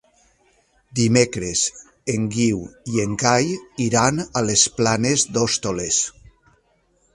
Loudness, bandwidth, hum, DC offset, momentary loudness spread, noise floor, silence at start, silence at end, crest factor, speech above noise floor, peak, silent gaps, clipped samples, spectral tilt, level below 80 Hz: -20 LUFS; 11.5 kHz; none; under 0.1%; 9 LU; -63 dBFS; 0.95 s; 1.05 s; 22 dB; 43 dB; 0 dBFS; none; under 0.1%; -3.5 dB/octave; -50 dBFS